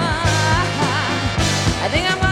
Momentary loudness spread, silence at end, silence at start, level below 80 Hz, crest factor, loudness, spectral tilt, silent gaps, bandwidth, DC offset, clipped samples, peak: 2 LU; 0 s; 0 s; -30 dBFS; 14 dB; -18 LUFS; -4 dB/octave; none; 15 kHz; under 0.1%; under 0.1%; -4 dBFS